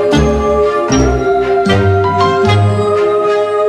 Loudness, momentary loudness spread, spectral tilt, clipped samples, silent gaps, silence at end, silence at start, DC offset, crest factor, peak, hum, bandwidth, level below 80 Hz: -12 LUFS; 2 LU; -6.5 dB/octave; under 0.1%; none; 0 s; 0 s; under 0.1%; 10 dB; -2 dBFS; none; 10.5 kHz; -24 dBFS